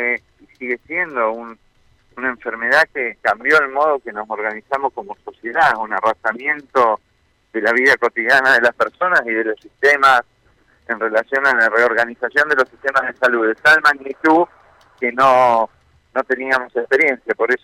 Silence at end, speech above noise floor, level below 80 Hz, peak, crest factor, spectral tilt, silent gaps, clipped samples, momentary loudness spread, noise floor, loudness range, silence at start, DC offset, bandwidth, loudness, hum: 0.05 s; 44 dB; -60 dBFS; -4 dBFS; 14 dB; -3.5 dB/octave; none; under 0.1%; 12 LU; -60 dBFS; 4 LU; 0 s; under 0.1%; 16.5 kHz; -16 LUFS; none